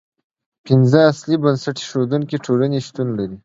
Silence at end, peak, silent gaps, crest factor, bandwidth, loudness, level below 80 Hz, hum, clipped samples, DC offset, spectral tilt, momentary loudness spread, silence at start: 0.1 s; 0 dBFS; none; 18 dB; 7.8 kHz; -17 LUFS; -58 dBFS; none; under 0.1%; under 0.1%; -7 dB/octave; 10 LU; 0.65 s